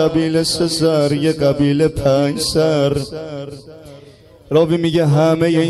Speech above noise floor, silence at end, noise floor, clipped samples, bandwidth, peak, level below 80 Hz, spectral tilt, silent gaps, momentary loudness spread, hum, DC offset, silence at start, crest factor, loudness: 28 dB; 0 s; -43 dBFS; under 0.1%; 13 kHz; -2 dBFS; -42 dBFS; -6 dB/octave; none; 13 LU; none; under 0.1%; 0 s; 14 dB; -15 LUFS